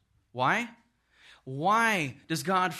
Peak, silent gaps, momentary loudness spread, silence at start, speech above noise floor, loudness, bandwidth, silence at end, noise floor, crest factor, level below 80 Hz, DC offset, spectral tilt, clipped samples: -12 dBFS; none; 16 LU; 0.35 s; 33 dB; -28 LUFS; 13.5 kHz; 0 s; -61 dBFS; 18 dB; -72 dBFS; under 0.1%; -4 dB/octave; under 0.1%